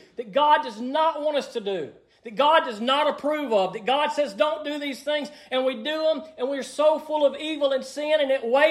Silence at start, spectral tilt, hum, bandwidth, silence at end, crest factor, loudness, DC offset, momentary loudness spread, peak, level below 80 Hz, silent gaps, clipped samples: 0.2 s; -3.5 dB/octave; none; 13 kHz; 0 s; 18 dB; -24 LUFS; under 0.1%; 9 LU; -6 dBFS; -74 dBFS; none; under 0.1%